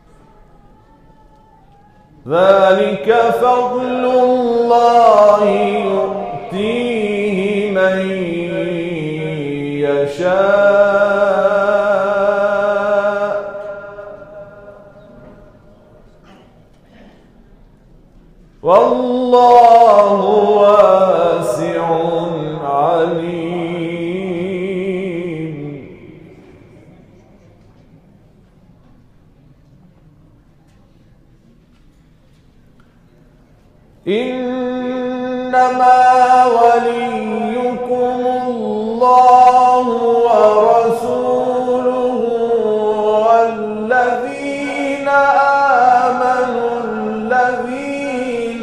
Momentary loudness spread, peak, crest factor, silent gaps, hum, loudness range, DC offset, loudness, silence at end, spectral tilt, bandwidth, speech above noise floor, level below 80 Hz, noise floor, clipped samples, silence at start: 12 LU; 0 dBFS; 14 dB; none; none; 12 LU; under 0.1%; -13 LUFS; 0 s; -6 dB/octave; 11.5 kHz; 37 dB; -50 dBFS; -48 dBFS; under 0.1%; 2.25 s